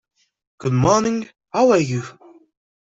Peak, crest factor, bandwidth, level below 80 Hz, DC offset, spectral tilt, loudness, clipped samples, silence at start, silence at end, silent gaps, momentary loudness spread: -4 dBFS; 18 dB; 8 kHz; -50 dBFS; under 0.1%; -6 dB/octave; -19 LUFS; under 0.1%; 0.6 s; 0.75 s; none; 12 LU